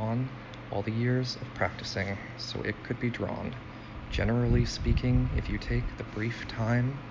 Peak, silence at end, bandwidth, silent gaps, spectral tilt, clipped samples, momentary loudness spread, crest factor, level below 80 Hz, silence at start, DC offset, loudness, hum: -12 dBFS; 0 s; 7.6 kHz; none; -6.5 dB/octave; under 0.1%; 10 LU; 18 dB; -38 dBFS; 0 s; under 0.1%; -31 LUFS; none